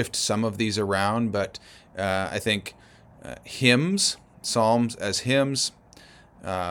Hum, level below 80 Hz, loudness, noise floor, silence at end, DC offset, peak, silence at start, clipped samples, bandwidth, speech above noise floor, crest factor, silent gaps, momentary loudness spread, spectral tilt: none; -58 dBFS; -24 LUFS; -51 dBFS; 0 s; under 0.1%; -2 dBFS; 0 s; under 0.1%; 20 kHz; 26 dB; 24 dB; none; 18 LU; -4 dB/octave